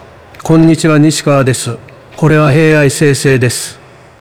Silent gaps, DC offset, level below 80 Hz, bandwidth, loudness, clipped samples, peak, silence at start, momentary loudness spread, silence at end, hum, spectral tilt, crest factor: none; under 0.1%; -38 dBFS; 16 kHz; -9 LUFS; 0.5%; 0 dBFS; 0.45 s; 12 LU; 0.45 s; none; -5.5 dB/octave; 10 dB